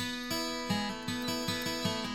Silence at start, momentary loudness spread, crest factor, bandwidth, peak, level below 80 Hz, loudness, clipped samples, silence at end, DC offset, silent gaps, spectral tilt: 0 s; 2 LU; 16 dB; 17.5 kHz; -18 dBFS; -56 dBFS; -34 LUFS; under 0.1%; 0 s; under 0.1%; none; -3.5 dB/octave